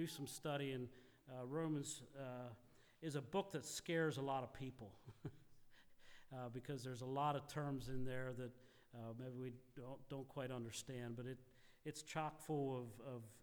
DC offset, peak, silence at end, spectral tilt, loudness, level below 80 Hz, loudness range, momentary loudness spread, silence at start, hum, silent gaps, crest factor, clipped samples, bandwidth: under 0.1%; -30 dBFS; 0 s; -5 dB/octave; -48 LUFS; -70 dBFS; 5 LU; 14 LU; 0 s; none; none; 18 dB; under 0.1%; over 20 kHz